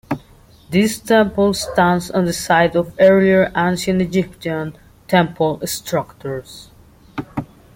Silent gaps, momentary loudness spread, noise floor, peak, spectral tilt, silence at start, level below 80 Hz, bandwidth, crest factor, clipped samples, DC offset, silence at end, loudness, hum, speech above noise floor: none; 15 LU; -47 dBFS; -2 dBFS; -5.5 dB/octave; 0.1 s; -46 dBFS; 17 kHz; 16 dB; under 0.1%; under 0.1%; 0.3 s; -17 LUFS; none; 30 dB